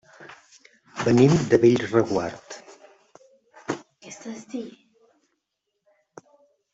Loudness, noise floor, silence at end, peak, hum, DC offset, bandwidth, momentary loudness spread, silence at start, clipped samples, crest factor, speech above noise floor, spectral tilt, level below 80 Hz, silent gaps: -22 LUFS; -79 dBFS; 2.05 s; -4 dBFS; none; under 0.1%; 8 kHz; 24 LU; 0.2 s; under 0.1%; 22 dB; 61 dB; -6.5 dB/octave; -58 dBFS; none